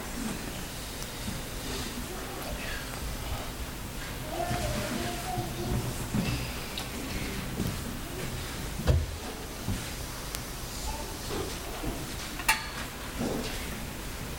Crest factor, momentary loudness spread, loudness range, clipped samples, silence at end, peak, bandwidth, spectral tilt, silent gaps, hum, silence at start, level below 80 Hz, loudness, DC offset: 28 dB; 7 LU; 3 LU; under 0.1%; 0 s; -6 dBFS; 17.5 kHz; -4 dB/octave; none; none; 0 s; -40 dBFS; -34 LUFS; under 0.1%